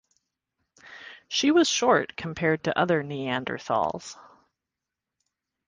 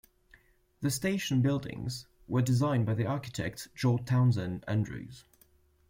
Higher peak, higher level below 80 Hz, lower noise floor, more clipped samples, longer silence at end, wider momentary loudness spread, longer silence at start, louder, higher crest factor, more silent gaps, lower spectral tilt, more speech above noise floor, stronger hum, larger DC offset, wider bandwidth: first, -8 dBFS vs -16 dBFS; second, -64 dBFS vs -58 dBFS; first, -87 dBFS vs -65 dBFS; neither; first, 1.45 s vs 0.7 s; first, 20 LU vs 11 LU; about the same, 0.85 s vs 0.8 s; first, -25 LUFS vs -31 LUFS; about the same, 20 dB vs 16 dB; neither; second, -4 dB/octave vs -6 dB/octave; first, 62 dB vs 35 dB; neither; neither; second, 10 kHz vs 16.5 kHz